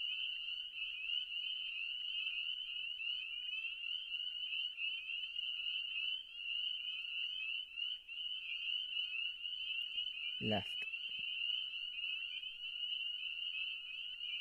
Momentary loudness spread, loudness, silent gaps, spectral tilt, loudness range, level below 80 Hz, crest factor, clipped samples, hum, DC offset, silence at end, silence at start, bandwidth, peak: 4 LU; -40 LUFS; none; -3.5 dB/octave; 1 LU; -78 dBFS; 18 dB; under 0.1%; none; under 0.1%; 0 s; 0 s; 15.5 kHz; -24 dBFS